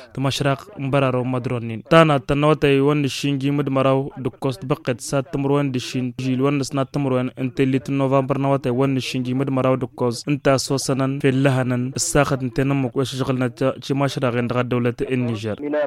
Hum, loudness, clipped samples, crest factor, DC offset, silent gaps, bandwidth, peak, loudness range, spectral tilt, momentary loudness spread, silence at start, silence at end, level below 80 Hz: none; -20 LUFS; under 0.1%; 20 dB; under 0.1%; none; 14.5 kHz; 0 dBFS; 4 LU; -6 dB/octave; 7 LU; 0 s; 0 s; -48 dBFS